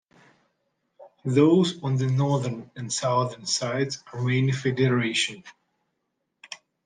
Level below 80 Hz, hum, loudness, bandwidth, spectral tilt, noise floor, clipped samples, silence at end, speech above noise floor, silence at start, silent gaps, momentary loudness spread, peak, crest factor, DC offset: -68 dBFS; none; -24 LUFS; 9.8 kHz; -5 dB/octave; -78 dBFS; under 0.1%; 0.3 s; 54 dB; 1 s; none; 15 LU; -6 dBFS; 20 dB; under 0.1%